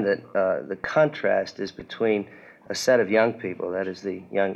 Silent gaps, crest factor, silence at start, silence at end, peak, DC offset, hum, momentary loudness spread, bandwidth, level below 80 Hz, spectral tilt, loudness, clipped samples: none; 18 dB; 0 s; 0 s; -6 dBFS; under 0.1%; none; 12 LU; 13 kHz; -64 dBFS; -5 dB/octave; -25 LUFS; under 0.1%